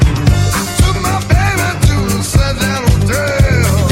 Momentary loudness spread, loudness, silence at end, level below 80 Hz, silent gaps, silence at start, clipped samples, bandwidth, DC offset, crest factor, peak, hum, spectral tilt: 3 LU; -13 LUFS; 0 s; -18 dBFS; none; 0 s; under 0.1%; 17 kHz; under 0.1%; 12 dB; 0 dBFS; none; -5 dB/octave